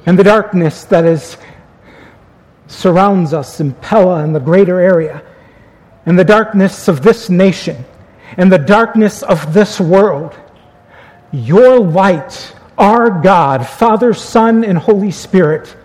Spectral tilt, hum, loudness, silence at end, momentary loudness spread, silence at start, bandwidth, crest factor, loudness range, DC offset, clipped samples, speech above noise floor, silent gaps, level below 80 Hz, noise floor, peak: -7 dB/octave; none; -10 LUFS; 0.15 s; 14 LU; 0.05 s; 13.5 kHz; 10 dB; 3 LU; 0.1%; 0.6%; 34 dB; none; -46 dBFS; -44 dBFS; 0 dBFS